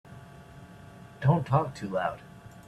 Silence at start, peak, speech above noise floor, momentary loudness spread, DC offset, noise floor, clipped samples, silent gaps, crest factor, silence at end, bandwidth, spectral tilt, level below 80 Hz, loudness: 0.1 s; -12 dBFS; 22 dB; 23 LU; under 0.1%; -49 dBFS; under 0.1%; none; 20 dB; 0.05 s; 11 kHz; -8 dB/octave; -58 dBFS; -28 LUFS